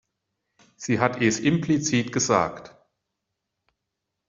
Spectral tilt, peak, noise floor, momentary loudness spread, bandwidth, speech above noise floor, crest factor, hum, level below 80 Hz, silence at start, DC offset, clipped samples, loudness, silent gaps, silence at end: -4.5 dB/octave; -4 dBFS; -82 dBFS; 8 LU; 7.8 kHz; 59 dB; 24 dB; none; -62 dBFS; 0.8 s; under 0.1%; under 0.1%; -23 LUFS; none; 1.6 s